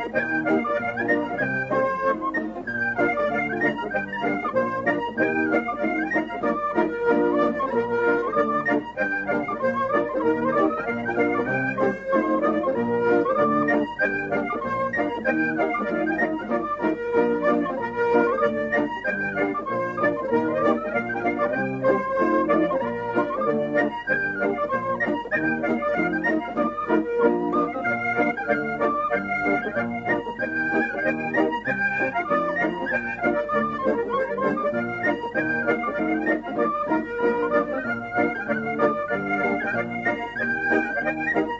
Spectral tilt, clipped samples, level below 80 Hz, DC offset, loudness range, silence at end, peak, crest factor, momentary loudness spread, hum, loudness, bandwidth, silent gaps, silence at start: -7.5 dB/octave; under 0.1%; -56 dBFS; under 0.1%; 1 LU; 0 s; -6 dBFS; 18 dB; 4 LU; none; -24 LUFS; 7.6 kHz; none; 0 s